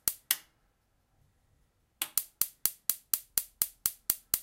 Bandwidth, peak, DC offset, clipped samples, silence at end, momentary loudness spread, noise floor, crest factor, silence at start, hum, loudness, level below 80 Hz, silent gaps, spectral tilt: 17 kHz; -2 dBFS; under 0.1%; under 0.1%; 0 s; 3 LU; -73 dBFS; 34 dB; 0.05 s; none; -31 LUFS; -66 dBFS; none; 1 dB/octave